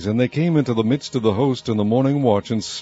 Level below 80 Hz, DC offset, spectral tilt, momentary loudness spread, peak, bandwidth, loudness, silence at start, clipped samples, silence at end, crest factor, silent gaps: -56 dBFS; under 0.1%; -7 dB/octave; 3 LU; -4 dBFS; 8 kHz; -19 LUFS; 0 s; under 0.1%; 0 s; 16 dB; none